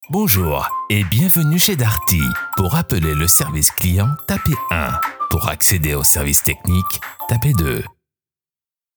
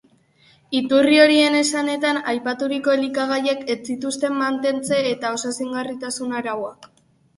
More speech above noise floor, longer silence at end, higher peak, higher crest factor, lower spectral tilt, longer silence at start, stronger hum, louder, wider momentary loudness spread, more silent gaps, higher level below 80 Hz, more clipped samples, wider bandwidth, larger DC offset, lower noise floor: first, over 73 dB vs 36 dB; first, 1.05 s vs 0.5 s; about the same, 0 dBFS vs 0 dBFS; about the same, 18 dB vs 20 dB; about the same, -4 dB/octave vs -3 dB/octave; second, 0 s vs 0.7 s; neither; first, -16 LUFS vs -20 LUFS; second, 8 LU vs 13 LU; neither; first, -32 dBFS vs -66 dBFS; neither; first, over 20 kHz vs 11.5 kHz; neither; first, under -90 dBFS vs -56 dBFS